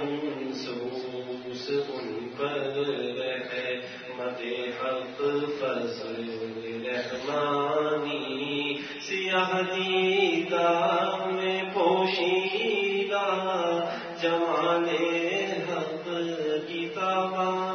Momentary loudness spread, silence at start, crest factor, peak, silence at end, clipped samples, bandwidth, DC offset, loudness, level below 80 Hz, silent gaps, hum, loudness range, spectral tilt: 10 LU; 0 s; 16 dB; -12 dBFS; 0 s; under 0.1%; 6.6 kHz; under 0.1%; -28 LUFS; -78 dBFS; none; none; 6 LU; -5 dB/octave